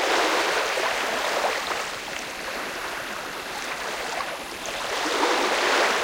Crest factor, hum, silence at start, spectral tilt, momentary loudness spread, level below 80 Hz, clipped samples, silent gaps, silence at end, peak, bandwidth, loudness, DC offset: 18 dB; none; 0 s; -1 dB/octave; 10 LU; -58 dBFS; under 0.1%; none; 0 s; -8 dBFS; 17 kHz; -25 LUFS; under 0.1%